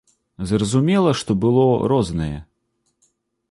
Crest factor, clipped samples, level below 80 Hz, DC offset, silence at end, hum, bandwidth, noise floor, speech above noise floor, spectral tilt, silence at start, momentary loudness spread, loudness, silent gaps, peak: 16 dB; under 0.1%; -42 dBFS; under 0.1%; 1.05 s; none; 11.5 kHz; -70 dBFS; 53 dB; -6.5 dB/octave; 0.4 s; 12 LU; -19 LUFS; none; -4 dBFS